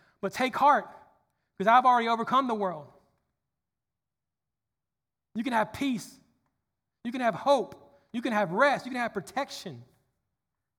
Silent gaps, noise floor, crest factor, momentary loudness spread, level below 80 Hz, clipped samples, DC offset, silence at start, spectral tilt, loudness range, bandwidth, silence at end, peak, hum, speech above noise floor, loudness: none; under -90 dBFS; 22 dB; 18 LU; -72 dBFS; under 0.1%; under 0.1%; 0.25 s; -5 dB/octave; 9 LU; over 20 kHz; 0.95 s; -8 dBFS; none; over 63 dB; -27 LUFS